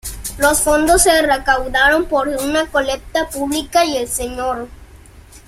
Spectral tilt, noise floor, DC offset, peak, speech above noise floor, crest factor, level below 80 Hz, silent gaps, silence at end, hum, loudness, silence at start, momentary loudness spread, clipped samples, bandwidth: -2 dB/octave; -41 dBFS; under 0.1%; 0 dBFS; 25 dB; 16 dB; -34 dBFS; none; 0.1 s; none; -15 LUFS; 0.05 s; 10 LU; under 0.1%; 16.5 kHz